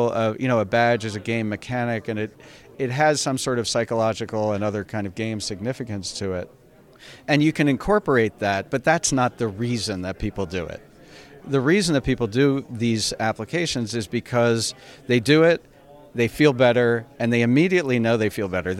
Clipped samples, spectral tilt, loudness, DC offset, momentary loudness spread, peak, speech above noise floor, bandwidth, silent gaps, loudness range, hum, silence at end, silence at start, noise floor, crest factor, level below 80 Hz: under 0.1%; -5 dB/octave; -22 LUFS; under 0.1%; 11 LU; -4 dBFS; 24 dB; 16 kHz; none; 5 LU; none; 0 s; 0 s; -46 dBFS; 18 dB; -48 dBFS